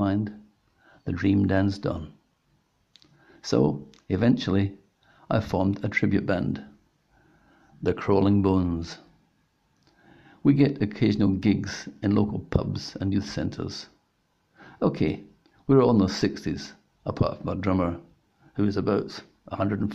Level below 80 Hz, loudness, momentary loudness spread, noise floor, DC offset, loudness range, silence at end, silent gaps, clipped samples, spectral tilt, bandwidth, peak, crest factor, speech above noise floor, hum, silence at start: -52 dBFS; -26 LUFS; 16 LU; -70 dBFS; under 0.1%; 4 LU; 0 s; none; under 0.1%; -7.5 dB/octave; 8 kHz; -6 dBFS; 20 dB; 46 dB; none; 0 s